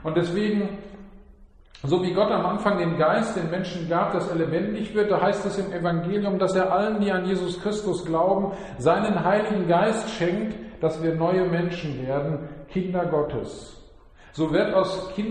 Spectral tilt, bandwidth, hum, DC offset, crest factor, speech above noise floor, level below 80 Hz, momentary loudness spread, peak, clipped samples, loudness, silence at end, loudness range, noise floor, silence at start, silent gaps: -6.5 dB/octave; 9.8 kHz; none; under 0.1%; 16 dB; 27 dB; -50 dBFS; 8 LU; -8 dBFS; under 0.1%; -24 LUFS; 0 s; 3 LU; -50 dBFS; 0 s; none